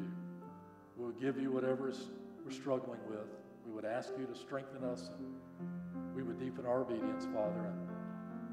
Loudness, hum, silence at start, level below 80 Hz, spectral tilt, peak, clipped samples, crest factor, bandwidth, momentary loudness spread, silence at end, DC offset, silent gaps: -42 LUFS; none; 0 s; -80 dBFS; -7 dB/octave; -24 dBFS; under 0.1%; 18 dB; 11.5 kHz; 13 LU; 0 s; under 0.1%; none